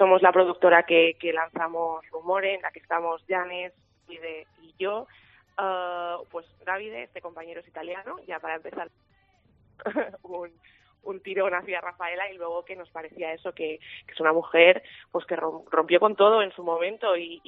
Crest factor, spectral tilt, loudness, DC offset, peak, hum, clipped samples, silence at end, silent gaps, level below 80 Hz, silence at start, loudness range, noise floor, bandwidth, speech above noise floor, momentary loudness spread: 24 dB; -1 dB/octave; -25 LUFS; under 0.1%; -2 dBFS; none; under 0.1%; 0.1 s; none; -74 dBFS; 0 s; 14 LU; -63 dBFS; 4 kHz; 38 dB; 21 LU